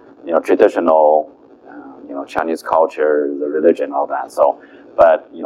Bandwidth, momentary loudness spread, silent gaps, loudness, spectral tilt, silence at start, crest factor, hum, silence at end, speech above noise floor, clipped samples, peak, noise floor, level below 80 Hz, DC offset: 12.5 kHz; 15 LU; none; -15 LUFS; -5.5 dB/octave; 0.25 s; 16 dB; none; 0 s; 24 dB; under 0.1%; 0 dBFS; -39 dBFS; -56 dBFS; under 0.1%